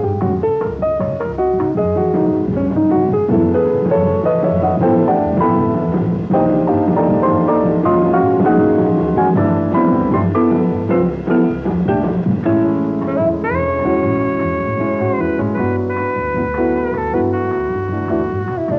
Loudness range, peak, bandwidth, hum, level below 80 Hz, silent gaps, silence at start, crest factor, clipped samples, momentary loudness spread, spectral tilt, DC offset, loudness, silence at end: 4 LU; -2 dBFS; 5.4 kHz; none; -38 dBFS; none; 0 s; 12 dB; under 0.1%; 5 LU; -11 dB/octave; 0.2%; -16 LUFS; 0 s